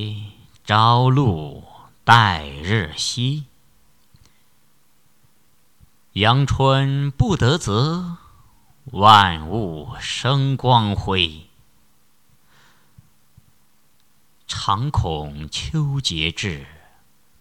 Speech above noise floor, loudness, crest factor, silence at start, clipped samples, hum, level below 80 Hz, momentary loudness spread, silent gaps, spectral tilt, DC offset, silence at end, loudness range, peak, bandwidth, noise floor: 44 dB; -19 LUFS; 20 dB; 0 s; under 0.1%; none; -40 dBFS; 16 LU; none; -5 dB/octave; 0.2%; 0.75 s; 10 LU; 0 dBFS; 13 kHz; -62 dBFS